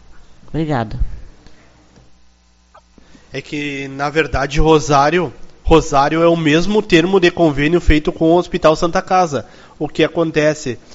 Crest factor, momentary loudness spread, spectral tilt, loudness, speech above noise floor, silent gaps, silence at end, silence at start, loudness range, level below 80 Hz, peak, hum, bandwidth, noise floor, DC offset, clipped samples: 16 dB; 13 LU; -4.5 dB/octave; -15 LUFS; 36 dB; none; 0 s; 0.1 s; 14 LU; -26 dBFS; 0 dBFS; none; 8 kHz; -50 dBFS; under 0.1%; under 0.1%